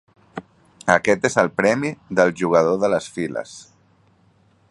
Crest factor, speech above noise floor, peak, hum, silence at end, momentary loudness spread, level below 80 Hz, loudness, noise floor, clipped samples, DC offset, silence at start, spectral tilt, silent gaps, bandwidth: 22 dB; 39 dB; 0 dBFS; none; 1.1 s; 20 LU; -58 dBFS; -20 LUFS; -58 dBFS; under 0.1%; under 0.1%; 0.35 s; -5 dB/octave; none; 11.5 kHz